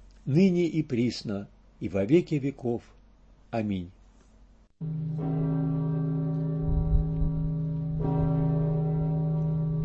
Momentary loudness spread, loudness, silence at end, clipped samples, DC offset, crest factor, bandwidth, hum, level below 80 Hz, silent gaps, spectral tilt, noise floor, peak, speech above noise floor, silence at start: 11 LU; -28 LUFS; 0 s; under 0.1%; under 0.1%; 18 dB; 7.6 kHz; none; -38 dBFS; none; -9 dB/octave; -56 dBFS; -10 dBFS; 29 dB; 0 s